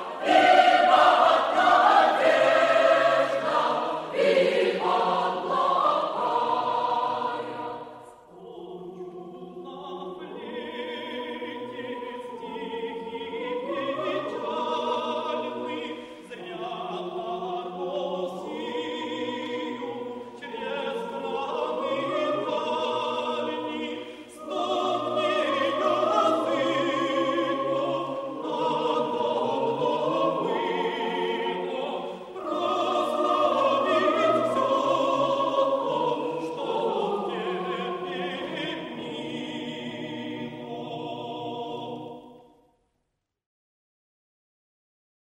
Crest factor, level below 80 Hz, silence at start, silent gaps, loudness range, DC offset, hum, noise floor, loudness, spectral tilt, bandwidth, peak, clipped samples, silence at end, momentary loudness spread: 20 dB; -72 dBFS; 0 s; none; 14 LU; under 0.1%; none; -79 dBFS; -26 LUFS; -4.5 dB/octave; 12.5 kHz; -6 dBFS; under 0.1%; 2.95 s; 16 LU